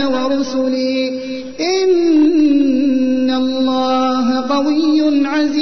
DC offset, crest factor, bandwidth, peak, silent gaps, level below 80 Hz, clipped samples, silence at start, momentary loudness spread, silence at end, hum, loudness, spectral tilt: 2%; 10 dB; 6.4 kHz; -6 dBFS; none; -54 dBFS; under 0.1%; 0 s; 6 LU; 0 s; none; -15 LUFS; -4 dB/octave